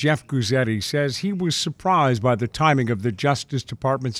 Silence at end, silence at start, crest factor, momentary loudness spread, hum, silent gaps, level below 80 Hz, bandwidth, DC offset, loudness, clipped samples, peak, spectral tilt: 0 s; 0 s; 18 dB; 5 LU; none; none; -54 dBFS; 14 kHz; under 0.1%; -22 LUFS; under 0.1%; -4 dBFS; -5.5 dB/octave